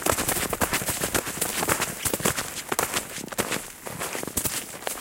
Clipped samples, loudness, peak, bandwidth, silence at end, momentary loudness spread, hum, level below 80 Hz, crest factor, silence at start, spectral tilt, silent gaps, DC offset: under 0.1%; -26 LUFS; -2 dBFS; 17 kHz; 0 s; 7 LU; none; -48 dBFS; 26 dB; 0 s; -2 dB/octave; none; under 0.1%